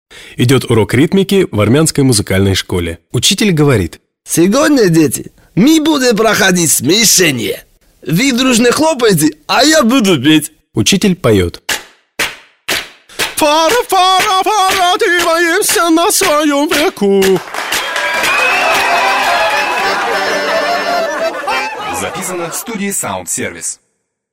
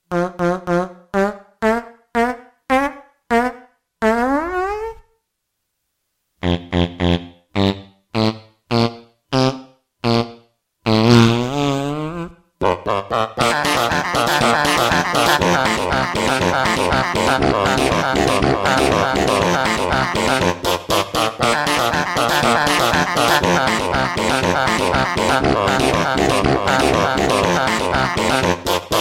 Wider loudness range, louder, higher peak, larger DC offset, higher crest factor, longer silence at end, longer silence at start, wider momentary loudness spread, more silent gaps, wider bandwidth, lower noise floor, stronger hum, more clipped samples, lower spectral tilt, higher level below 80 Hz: about the same, 4 LU vs 6 LU; first, -11 LUFS vs -17 LUFS; about the same, 0 dBFS vs 0 dBFS; neither; second, 12 dB vs 18 dB; first, 0.55 s vs 0 s; about the same, 0.1 s vs 0.1 s; first, 10 LU vs 7 LU; neither; about the same, 16.5 kHz vs 16.5 kHz; second, -65 dBFS vs -75 dBFS; neither; neither; about the same, -3.5 dB/octave vs -4.5 dB/octave; about the same, -42 dBFS vs -38 dBFS